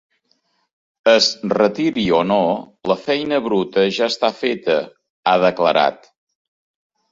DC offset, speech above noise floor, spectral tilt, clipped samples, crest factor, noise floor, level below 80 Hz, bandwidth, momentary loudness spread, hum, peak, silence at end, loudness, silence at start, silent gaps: under 0.1%; 48 dB; -4.5 dB/octave; under 0.1%; 18 dB; -65 dBFS; -58 dBFS; 7.8 kHz; 7 LU; none; -2 dBFS; 1.2 s; -18 LUFS; 1.05 s; 5.10-5.23 s